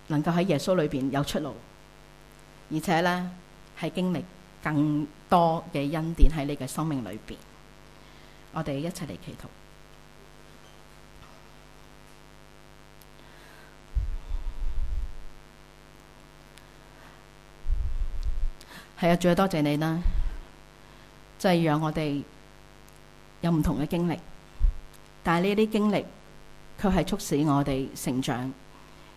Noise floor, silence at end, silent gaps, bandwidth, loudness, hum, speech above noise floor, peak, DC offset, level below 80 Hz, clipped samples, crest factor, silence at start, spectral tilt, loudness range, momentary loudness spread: -52 dBFS; 0.05 s; none; 15 kHz; -28 LUFS; 50 Hz at -55 dBFS; 26 dB; -6 dBFS; 0.1%; -36 dBFS; under 0.1%; 24 dB; 0.1 s; -6.5 dB/octave; 14 LU; 23 LU